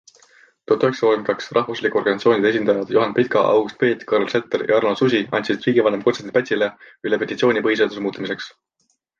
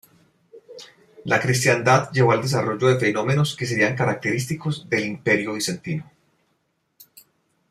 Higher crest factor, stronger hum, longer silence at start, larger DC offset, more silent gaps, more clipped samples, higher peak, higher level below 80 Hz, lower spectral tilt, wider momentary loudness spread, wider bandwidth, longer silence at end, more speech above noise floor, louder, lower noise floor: about the same, 16 dB vs 20 dB; neither; first, 0.7 s vs 0.55 s; neither; neither; neither; about the same, -4 dBFS vs -2 dBFS; about the same, -64 dBFS vs -60 dBFS; about the same, -6 dB/octave vs -5 dB/octave; second, 7 LU vs 12 LU; second, 7.2 kHz vs 15.5 kHz; second, 0.7 s vs 1.7 s; second, 34 dB vs 50 dB; about the same, -19 LUFS vs -21 LUFS; second, -53 dBFS vs -70 dBFS